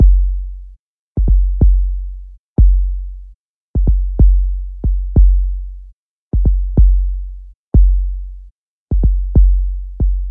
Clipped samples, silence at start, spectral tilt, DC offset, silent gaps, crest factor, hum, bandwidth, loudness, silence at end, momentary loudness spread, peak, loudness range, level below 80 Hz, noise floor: under 0.1%; 0 s; -14 dB/octave; under 0.1%; 0.79-1.15 s, 2.39-2.56 s, 3.34-3.74 s, 5.93-6.31 s, 7.55-7.72 s, 8.51-8.88 s; 12 dB; 50 Hz at -25 dBFS; 0.9 kHz; -17 LUFS; 0 s; 17 LU; 0 dBFS; 2 LU; -14 dBFS; -43 dBFS